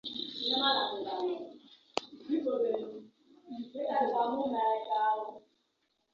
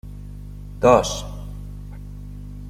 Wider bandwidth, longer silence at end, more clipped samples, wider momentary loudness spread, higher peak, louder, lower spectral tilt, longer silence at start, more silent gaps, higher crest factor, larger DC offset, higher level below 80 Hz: second, 7.4 kHz vs 16 kHz; first, 0.75 s vs 0 s; neither; second, 16 LU vs 22 LU; second, -10 dBFS vs -2 dBFS; second, -32 LUFS vs -19 LUFS; second, 0 dB/octave vs -5 dB/octave; about the same, 0.05 s vs 0.05 s; neither; about the same, 24 dB vs 22 dB; neither; second, -80 dBFS vs -36 dBFS